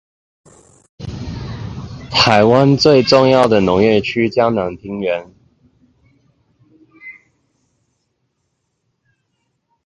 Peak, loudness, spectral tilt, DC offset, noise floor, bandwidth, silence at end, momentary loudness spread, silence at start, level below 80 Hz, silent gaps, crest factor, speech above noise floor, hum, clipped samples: 0 dBFS; -13 LUFS; -6 dB/octave; under 0.1%; -70 dBFS; 11 kHz; 2.75 s; 21 LU; 1 s; -44 dBFS; none; 18 dB; 57 dB; none; under 0.1%